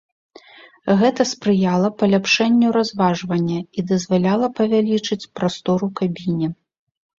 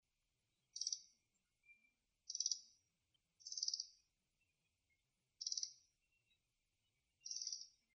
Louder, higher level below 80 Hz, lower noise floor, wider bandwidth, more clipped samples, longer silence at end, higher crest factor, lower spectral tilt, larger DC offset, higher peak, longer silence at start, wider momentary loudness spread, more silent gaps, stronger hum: first, -19 LUFS vs -46 LUFS; first, -58 dBFS vs under -90 dBFS; second, -45 dBFS vs -89 dBFS; second, 7.6 kHz vs 8.8 kHz; neither; first, 0.65 s vs 0.25 s; second, 16 dB vs 28 dB; first, -6 dB/octave vs 5 dB/octave; neither; first, -2 dBFS vs -26 dBFS; about the same, 0.85 s vs 0.75 s; second, 8 LU vs 14 LU; neither; neither